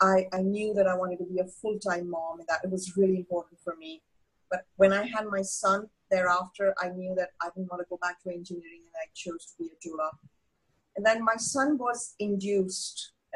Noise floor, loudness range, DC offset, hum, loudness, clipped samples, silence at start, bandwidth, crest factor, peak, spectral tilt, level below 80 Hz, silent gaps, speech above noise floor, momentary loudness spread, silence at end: -75 dBFS; 8 LU; under 0.1%; none; -29 LUFS; under 0.1%; 0 s; 12 kHz; 20 dB; -10 dBFS; -4.5 dB/octave; -68 dBFS; none; 45 dB; 15 LU; 0 s